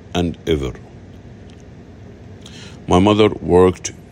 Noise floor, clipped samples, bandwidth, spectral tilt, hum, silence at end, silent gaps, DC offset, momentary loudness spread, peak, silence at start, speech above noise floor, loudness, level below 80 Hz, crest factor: -39 dBFS; under 0.1%; 11.5 kHz; -6 dB/octave; none; 0.1 s; none; under 0.1%; 24 LU; 0 dBFS; 0.15 s; 24 dB; -16 LUFS; -40 dBFS; 18 dB